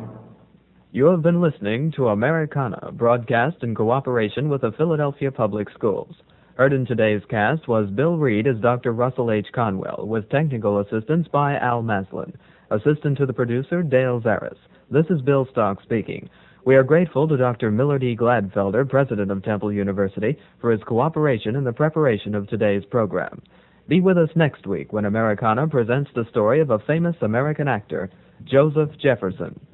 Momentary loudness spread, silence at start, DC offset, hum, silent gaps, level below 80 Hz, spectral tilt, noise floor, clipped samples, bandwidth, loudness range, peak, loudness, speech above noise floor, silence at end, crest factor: 8 LU; 0 s; under 0.1%; none; none; -58 dBFS; -10 dB/octave; -54 dBFS; under 0.1%; 4.1 kHz; 2 LU; -2 dBFS; -21 LUFS; 34 dB; 0.2 s; 18 dB